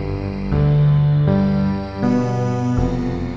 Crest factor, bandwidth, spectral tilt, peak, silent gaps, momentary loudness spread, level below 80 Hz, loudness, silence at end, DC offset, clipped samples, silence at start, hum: 10 dB; 7.2 kHz; -9 dB/octave; -6 dBFS; none; 7 LU; -30 dBFS; -18 LUFS; 0 s; 0.7%; under 0.1%; 0 s; none